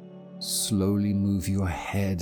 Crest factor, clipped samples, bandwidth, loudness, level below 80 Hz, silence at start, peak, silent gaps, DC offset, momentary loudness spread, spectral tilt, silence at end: 12 dB; under 0.1%; over 20 kHz; -27 LUFS; -50 dBFS; 0 s; -16 dBFS; none; under 0.1%; 6 LU; -5 dB/octave; 0 s